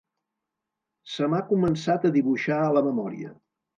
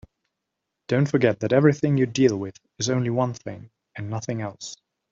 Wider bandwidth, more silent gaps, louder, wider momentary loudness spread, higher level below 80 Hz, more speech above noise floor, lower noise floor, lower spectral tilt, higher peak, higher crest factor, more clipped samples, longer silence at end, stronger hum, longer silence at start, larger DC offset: first, 8.8 kHz vs 7.6 kHz; neither; about the same, -24 LUFS vs -23 LUFS; second, 14 LU vs 18 LU; about the same, -64 dBFS vs -60 dBFS; about the same, 61 dB vs 59 dB; about the same, -85 dBFS vs -82 dBFS; about the same, -7 dB/octave vs -6 dB/octave; second, -8 dBFS vs -4 dBFS; about the same, 18 dB vs 20 dB; neither; about the same, 0.45 s vs 0.35 s; neither; first, 1.05 s vs 0.9 s; neither